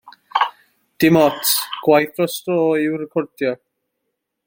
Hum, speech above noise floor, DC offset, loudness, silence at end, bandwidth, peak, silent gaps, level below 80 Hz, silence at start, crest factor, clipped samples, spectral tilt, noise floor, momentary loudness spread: none; 59 dB; under 0.1%; -18 LUFS; 0.9 s; 17 kHz; -2 dBFS; none; -60 dBFS; 0.05 s; 18 dB; under 0.1%; -4.5 dB/octave; -76 dBFS; 10 LU